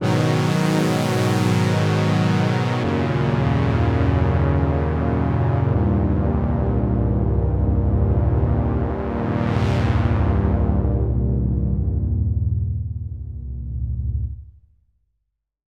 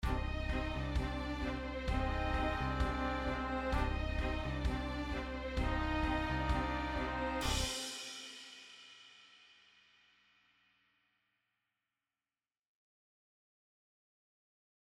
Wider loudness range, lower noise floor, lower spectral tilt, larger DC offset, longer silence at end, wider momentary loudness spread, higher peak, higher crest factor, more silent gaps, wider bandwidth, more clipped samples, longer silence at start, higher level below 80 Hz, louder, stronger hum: second, 5 LU vs 10 LU; second, -75 dBFS vs under -90 dBFS; first, -7.5 dB/octave vs -5 dB/octave; neither; second, 1.25 s vs 5.55 s; second, 7 LU vs 13 LU; first, -6 dBFS vs -20 dBFS; second, 12 dB vs 18 dB; neither; second, 13.5 kHz vs 15 kHz; neither; about the same, 0 s vs 0 s; first, -28 dBFS vs -42 dBFS; first, -20 LUFS vs -38 LUFS; first, 50 Hz at -55 dBFS vs none